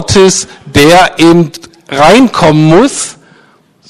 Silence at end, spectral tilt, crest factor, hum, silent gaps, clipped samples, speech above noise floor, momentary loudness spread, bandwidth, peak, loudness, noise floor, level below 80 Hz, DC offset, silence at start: 0.8 s; -4.5 dB/octave; 8 dB; none; none; 3%; 39 dB; 12 LU; 14 kHz; 0 dBFS; -6 LUFS; -45 dBFS; -34 dBFS; under 0.1%; 0 s